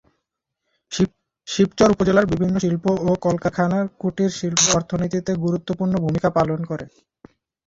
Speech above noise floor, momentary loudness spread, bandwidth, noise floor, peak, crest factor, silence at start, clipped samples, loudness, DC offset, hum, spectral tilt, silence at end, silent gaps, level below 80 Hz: 59 dB; 10 LU; 7.8 kHz; -79 dBFS; -2 dBFS; 20 dB; 0.9 s; under 0.1%; -20 LUFS; under 0.1%; none; -5 dB/octave; 0.8 s; none; -48 dBFS